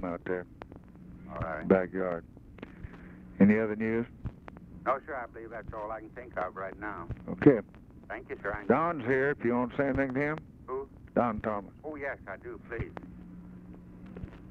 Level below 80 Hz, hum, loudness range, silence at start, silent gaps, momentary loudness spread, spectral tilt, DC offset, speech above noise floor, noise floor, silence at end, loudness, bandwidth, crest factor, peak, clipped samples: -52 dBFS; none; 7 LU; 0 s; none; 23 LU; -10 dB/octave; under 0.1%; 19 dB; -49 dBFS; 0 s; -31 LUFS; 5 kHz; 26 dB; -6 dBFS; under 0.1%